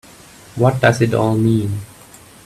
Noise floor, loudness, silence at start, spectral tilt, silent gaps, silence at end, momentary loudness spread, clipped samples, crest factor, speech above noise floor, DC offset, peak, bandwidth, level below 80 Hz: -42 dBFS; -16 LUFS; 0.55 s; -7 dB/octave; none; 0.6 s; 16 LU; under 0.1%; 18 dB; 28 dB; under 0.1%; 0 dBFS; 14 kHz; -48 dBFS